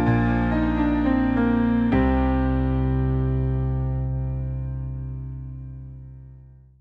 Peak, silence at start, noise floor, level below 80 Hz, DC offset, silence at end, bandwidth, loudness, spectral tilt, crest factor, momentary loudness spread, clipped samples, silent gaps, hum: -8 dBFS; 0 s; -47 dBFS; -30 dBFS; under 0.1%; 0.4 s; 4.8 kHz; -23 LUFS; -10.5 dB/octave; 14 dB; 16 LU; under 0.1%; none; none